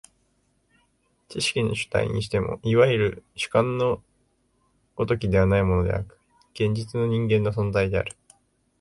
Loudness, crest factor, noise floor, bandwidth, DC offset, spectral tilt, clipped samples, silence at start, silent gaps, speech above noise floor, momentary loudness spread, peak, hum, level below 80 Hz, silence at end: -24 LUFS; 20 dB; -68 dBFS; 11.5 kHz; under 0.1%; -6 dB/octave; under 0.1%; 1.3 s; none; 45 dB; 11 LU; -6 dBFS; none; -42 dBFS; 0.7 s